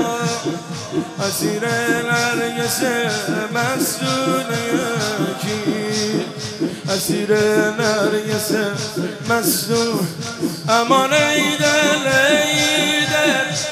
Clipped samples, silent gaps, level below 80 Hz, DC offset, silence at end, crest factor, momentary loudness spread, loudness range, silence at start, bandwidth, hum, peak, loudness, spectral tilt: under 0.1%; none; -58 dBFS; under 0.1%; 0 s; 16 dB; 9 LU; 5 LU; 0 s; 15.5 kHz; none; -2 dBFS; -18 LUFS; -3.5 dB/octave